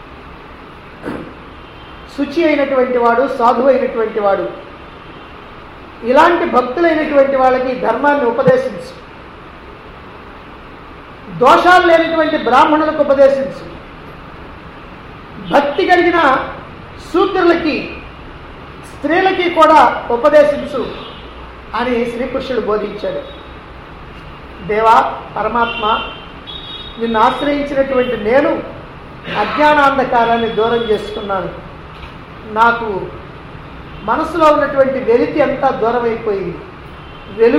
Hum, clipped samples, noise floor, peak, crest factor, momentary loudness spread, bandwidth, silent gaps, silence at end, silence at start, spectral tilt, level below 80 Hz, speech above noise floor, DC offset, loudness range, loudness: none; under 0.1%; -34 dBFS; 0 dBFS; 14 dB; 24 LU; 12.5 kHz; none; 0 s; 0 s; -6 dB/octave; -40 dBFS; 22 dB; under 0.1%; 5 LU; -13 LUFS